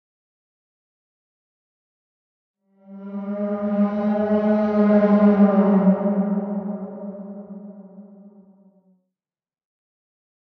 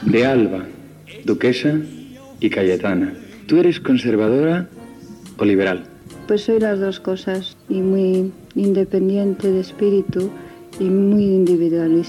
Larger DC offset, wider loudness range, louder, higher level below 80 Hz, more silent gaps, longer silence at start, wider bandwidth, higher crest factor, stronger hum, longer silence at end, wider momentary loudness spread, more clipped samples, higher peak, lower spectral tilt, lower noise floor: neither; first, 18 LU vs 2 LU; about the same, -19 LUFS vs -18 LUFS; second, -68 dBFS vs -54 dBFS; neither; first, 2.9 s vs 0 s; second, 4.4 kHz vs 13 kHz; first, 18 dB vs 12 dB; neither; first, 2.2 s vs 0 s; about the same, 21 LU vs 20 LU; neither; about the same, -6 dBFS vs -6 dBFS; first, -11.5 dB/octave vs -7.5 dB/octave; first, under -90 dBFS vs -38 dBFS